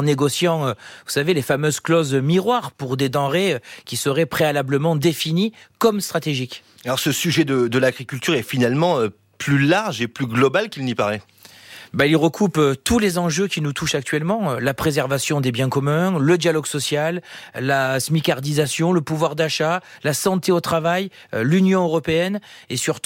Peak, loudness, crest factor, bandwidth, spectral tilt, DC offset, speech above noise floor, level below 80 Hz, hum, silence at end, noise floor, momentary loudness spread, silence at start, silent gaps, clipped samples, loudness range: -4 dBFS; -20 LUFS; 16 dB; 17 kHz; -5 dB/octave; under 0.1%; 23 dB; -52 dBFS; none; 0.05 s; -42 dBFS; 7 LU; 0 s; none; under 0.1%; 1 LU